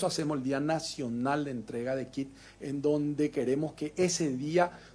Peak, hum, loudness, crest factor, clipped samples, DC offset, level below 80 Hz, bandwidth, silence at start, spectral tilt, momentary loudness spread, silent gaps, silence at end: -14 dBFS; none; -31 LUFS; 18 dB; under 0.1%; under 0.1%; -64 dBFS; 11 kHz; 0 s; -5 dB/octave; 9 LU; none; 0 s